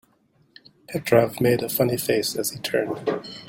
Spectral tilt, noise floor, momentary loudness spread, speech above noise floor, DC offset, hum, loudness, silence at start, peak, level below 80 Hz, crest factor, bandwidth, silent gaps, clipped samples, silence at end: -4.5 dB/octave; -63 dBFS; 8 LU; 40 dB; under 0.1%; none; -23 LUFS; 0.9 s; -4 dBFS; -60 dBFS; 20 dB; 17 kHz; none; under 0.1%; 0 s